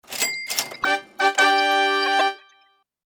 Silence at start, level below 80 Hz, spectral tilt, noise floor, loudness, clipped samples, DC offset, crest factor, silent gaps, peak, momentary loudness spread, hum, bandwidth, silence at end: 0.1 s; -70 dBFS; 0.5 dB/octave; -61 dBFS; -20 LUFS; under 0.1%; under 0.1%; 20 dB; none; -4 dBFS; 8 LU; none; over 20 kHz; 0.7 s